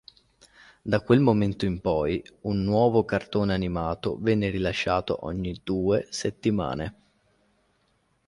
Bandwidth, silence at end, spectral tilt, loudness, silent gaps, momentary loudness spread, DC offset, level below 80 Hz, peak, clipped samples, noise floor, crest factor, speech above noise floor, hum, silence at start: 11.5 kHz; 1.35 s; -6.5 dB/octave; -26 LUFS; none; 10 LU; under 0.1%; -46 dBFS; -6 dBFS; under 0.1%; -69 dBFS; 20 dB; 44 dB; none; 0.85 s